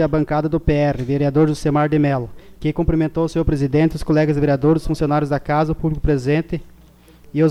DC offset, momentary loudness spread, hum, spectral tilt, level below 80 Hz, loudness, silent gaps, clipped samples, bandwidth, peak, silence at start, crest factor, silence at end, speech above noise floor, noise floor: under 0.1%; 5 LU; none; -8 dB/octave; -32 dBFS; -19 LUFS; none; under 0.1%; 12 kHz; -4 dBFS; 0 s; 14 dB; 0 s; 29 dB; -47 dBFS